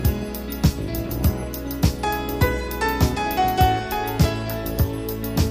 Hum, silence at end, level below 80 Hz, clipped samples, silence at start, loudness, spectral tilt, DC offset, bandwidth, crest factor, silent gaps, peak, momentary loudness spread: none; 0 s; -28 dBFS; under 0.1%; 0 s; -23 LUFS; -6 dB/octave; under 0.1%; 15.5 kHz; 18 dB; none; -4 dBFS; 8 LU